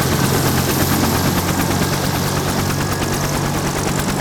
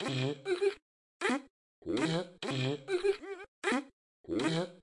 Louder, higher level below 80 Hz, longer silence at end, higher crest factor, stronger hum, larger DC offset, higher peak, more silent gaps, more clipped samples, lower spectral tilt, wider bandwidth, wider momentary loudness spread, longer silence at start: first, -17 LUFS vs -34 LUFS; first, -34 dBFS vs -70 dBFS; about the same, 0 s vs 0.05 s; about the same, 14 dB vs 18 dB; neither; neither; first, -4 dBFS vs -18 dBFS; second, none vs 0.82-1.20 s, 1.50-1.82 s, 3.48-3.62 s, 3.93-4.24 s; neither; about the same, -4.5 dB/octave vs -5.5 dB/octave; first, over 20 kHz vs 11.5 kHz; second, 3 LU vs 6 LU; about the same, 0 s vs 0 s